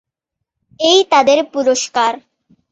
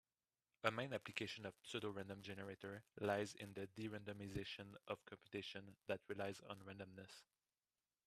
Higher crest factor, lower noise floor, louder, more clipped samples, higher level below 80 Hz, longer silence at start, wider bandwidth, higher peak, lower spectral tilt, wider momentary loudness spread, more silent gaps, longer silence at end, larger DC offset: second, 14 dB vs 30 dB; second, -79 dBFS vs under -90 dBFS; first, -13 LUFS vs -49 LUFS; neither; first, -64 dBFS vs -78 dBFS; first, 0.8 s vs 0.65 s; second, 8.4 kHz vs 14 kHz; first, 0 dBFS vs -20 dBFS; second, -1 dB/octave vs -5 dB/octave; second, 8 LU vs 11 LU; neither; second, 0.55 s vs 0.85 s; neither